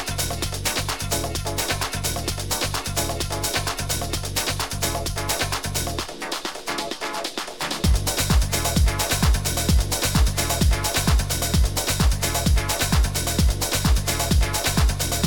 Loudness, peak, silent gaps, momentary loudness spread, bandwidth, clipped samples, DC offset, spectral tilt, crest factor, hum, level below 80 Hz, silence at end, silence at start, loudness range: -23 LUFS; -6 dBFS; none; 7 LU; 17.5 kHz; under 0.1%; 0.7%; -3.5 dB/octave; 16 dB; none; -26 dBFS; 0 s; 0 s; 4 LU